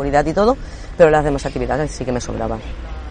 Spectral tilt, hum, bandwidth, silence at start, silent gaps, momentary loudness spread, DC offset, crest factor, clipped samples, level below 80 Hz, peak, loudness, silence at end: -6 dB/octave; none; 10 kHz; 0 s; none; 16 LU; under 0.1%; 16 dB; under 0.1%; -30 dBFS; -2 dBFS; -18 LUFS; 0 s